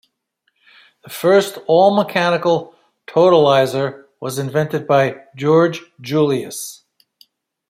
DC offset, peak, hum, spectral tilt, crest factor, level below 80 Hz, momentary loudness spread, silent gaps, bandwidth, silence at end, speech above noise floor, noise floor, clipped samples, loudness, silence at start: under 0.1%; -2 dBFS; none; -5.5 dB/octave; 16 dB; -64 dBFS; 14 LU; none; 16 kHz; 0.95 s; 53 dB; -69 dBFS; under 0.1%; -16 LUFS; 1.1 s